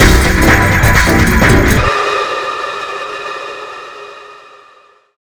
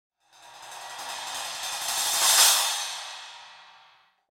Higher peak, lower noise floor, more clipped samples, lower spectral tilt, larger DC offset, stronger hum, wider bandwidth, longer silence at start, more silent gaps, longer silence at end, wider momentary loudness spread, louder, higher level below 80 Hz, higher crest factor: first, 0 dBFS vs -6 dBFS; second, -46 dBFS vs -59 dBFS; first, 0.5% vs under 0.1%; first, -4.5 dB/octave vs 3.5 dB/octave; neither; neither; first, over 20 kHz vs 16.5 kHz; second, 0 s vs 0.45 s; neither; first, 1 s vs 0.7 s; second, 18 LU vs 24 LU; first, -11 LUFS vs -22 LUFS; first, -18 dBFS vs -72 dBFS; second, 12 dB vs 22 dB